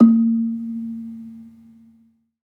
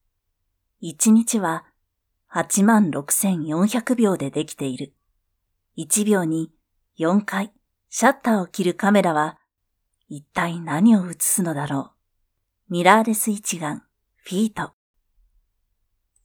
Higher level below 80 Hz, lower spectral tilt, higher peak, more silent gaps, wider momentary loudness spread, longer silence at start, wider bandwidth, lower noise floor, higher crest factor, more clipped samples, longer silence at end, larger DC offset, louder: second, -76 dBFS vs -66 dBFS; first, -11.5 dB/octave vs -4.5 dB/octave; about the same, -2 dBFS vs 0 dBFS; neither; first, 23 LU vs 17 LU; second, 0 s vs 0.8 s; second, 1.5 kHz vs 19 kHz; second, -58 dBFS vs -76 dBFS; about the same, 18 dB vs 22 dB; neither; second, 0.95 s vs 1.55 s; neither; about the same, -21 LUFS vs -21 LUFS